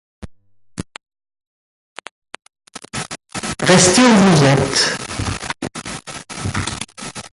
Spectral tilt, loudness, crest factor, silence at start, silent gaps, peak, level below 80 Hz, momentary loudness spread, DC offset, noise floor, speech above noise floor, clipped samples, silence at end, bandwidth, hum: -4 dB/octave; -15 LUFS; 18 dB; 0.2 s; 1.47-1.96 s, 2.11-2.22 s; 0 dBFS; -42 dBFS; 25 LU; under 0.1%; -45 dBFS; 34 dB; under 0.1%; 0.05 s; 11.5 kHz; none